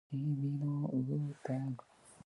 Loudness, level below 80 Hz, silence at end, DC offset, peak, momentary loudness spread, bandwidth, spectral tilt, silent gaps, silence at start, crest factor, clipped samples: -38 LUFS; -76 dBFS; 0.1 s; under 0.1%; -24 dBFS; 5 LU; 11 kHz; -9.5 dB/octave; none; 0.1 s; 14 dB; under 0.1%